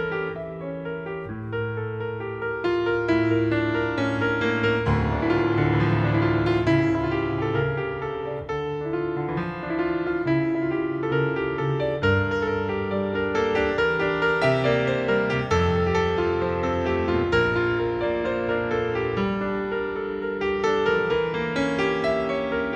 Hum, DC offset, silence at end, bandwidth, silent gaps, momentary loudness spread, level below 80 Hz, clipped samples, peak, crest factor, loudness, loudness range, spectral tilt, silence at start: none; under 0.1%; 0 s; 8.4 kHz; none; 8 LU; -44 dBFS; under 0.1%; -8 dBFS; 16 dB; -24 LUFS; 4 LU; -7.5 dB/octave; 0 s